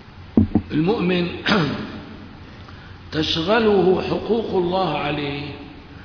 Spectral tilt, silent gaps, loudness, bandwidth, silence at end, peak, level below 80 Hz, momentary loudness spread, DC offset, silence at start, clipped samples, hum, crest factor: -7 dB/octave; none; -20 LUFS; 5.4 kHz; 0 s; -2 dBFS; -44 dBFS; 22 LU; under 0.1%; 0.05 s; under 0.1%; none; 20 dB